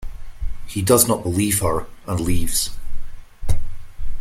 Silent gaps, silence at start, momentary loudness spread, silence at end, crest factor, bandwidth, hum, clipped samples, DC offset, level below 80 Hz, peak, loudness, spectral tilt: none; 0 s; 23 LU; 0 s; 18 dB; 16 kHz; none; under 0.1%; under 0.1%; -28 dBFS; 0 dBFS; -20 LUFS; -4 dB/octave